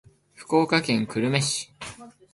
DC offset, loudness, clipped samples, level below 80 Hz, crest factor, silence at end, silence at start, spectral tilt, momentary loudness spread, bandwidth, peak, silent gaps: under 0.1%; -24 LUFS; under 0.1%; -62 dBFS; 18 dB; 0.25 s; 0.4 s; -4.5 dB/octave; 17 LU; 11.5 kHz; -8 dBFS; none